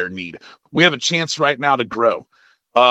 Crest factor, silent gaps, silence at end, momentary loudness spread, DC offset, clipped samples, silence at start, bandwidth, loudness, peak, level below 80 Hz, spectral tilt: 18 dB; none; 0 s; 13 LU; under 0.1%; under 0.1%; 0 s; 9.4 kHz; -17 LUFS; 0 dBFS; -64 dBFS; -3.5 dB/octave